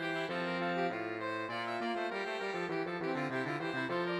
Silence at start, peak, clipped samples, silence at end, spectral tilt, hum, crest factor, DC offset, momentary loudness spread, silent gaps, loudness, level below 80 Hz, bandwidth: 0 s; -24 dBFS; under 0.1%; 0 s; -6 dB/octave; none; 14 dB; under 0.1%; 3 LU; none; -36 LUFS; -82 dBFS; 12 kHz